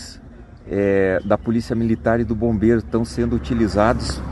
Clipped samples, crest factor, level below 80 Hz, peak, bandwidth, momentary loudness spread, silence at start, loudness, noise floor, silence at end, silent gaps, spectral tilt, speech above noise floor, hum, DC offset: under 0.1%; 18 dB; -34 dBFS; -2 dBFS; 11.5 kHz; 5 LU; 0 s; -20 LUFS; -40 dBFS; 0 s; none; -7 dB/octave; 22 dB; none; under 0.1%